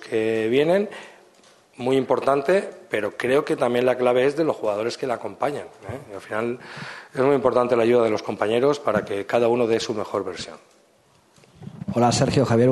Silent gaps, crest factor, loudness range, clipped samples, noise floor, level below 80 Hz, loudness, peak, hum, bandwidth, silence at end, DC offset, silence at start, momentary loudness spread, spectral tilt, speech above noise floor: none; 18 dB; 4 LU; under 0.1%; -58 dBFS; -60 dBFS; -22 LUFS; -4 dBFS; none; 12.5 kHz; 0 s; under 0.1%; 0 s; 15 LU; -5.5 dB/octave; 37 dB